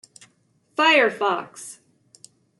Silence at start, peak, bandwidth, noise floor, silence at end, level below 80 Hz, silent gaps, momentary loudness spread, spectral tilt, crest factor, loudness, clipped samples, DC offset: 0.8 s; -6 dBFS; 12 kHz; -64 dBFS; 0.85 s; -80 dBFS; none; 22 LU; -2 dB/octave; 20 dB; -20 LUFS; under 0.1%; under 0.1%